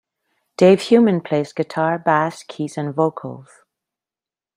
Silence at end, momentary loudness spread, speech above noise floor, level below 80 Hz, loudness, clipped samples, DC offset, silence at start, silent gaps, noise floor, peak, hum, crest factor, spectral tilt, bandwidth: 1.15 s; 15 LU; over 72 dB; -64 dBFS; -18 LUFS; under 0.1%; under 0.1%; 0.6 s; none; under -90 dBFS; -2 dBFS; none; 18 dB; -6.5 dB/octave; 11.5 kHz